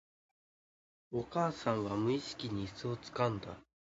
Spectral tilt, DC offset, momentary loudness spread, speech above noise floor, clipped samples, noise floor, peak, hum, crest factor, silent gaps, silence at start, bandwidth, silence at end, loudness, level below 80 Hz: -5.5 dB/octave; under 0.1%; 9 LU; over 54 dB; under 0.1%; under -90 dBFS; -18 dBFS; none; 20 dB; none; 1.1 s; 7.6 kHz; 0.35 s; -37 LUFS; -64 dBFS